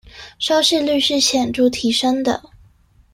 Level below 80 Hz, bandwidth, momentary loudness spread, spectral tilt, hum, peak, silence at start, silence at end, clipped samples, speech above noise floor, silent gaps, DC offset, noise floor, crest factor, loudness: -50 dBFS; 16 kHz; 7 LU; -2.5 dB/octave; none; -2 dBFS; 0.15 s; 0.75 s; under 0.1%; 35 dB; none; under 0.1%; -52 dBFS; 16 dB; -17 LUFS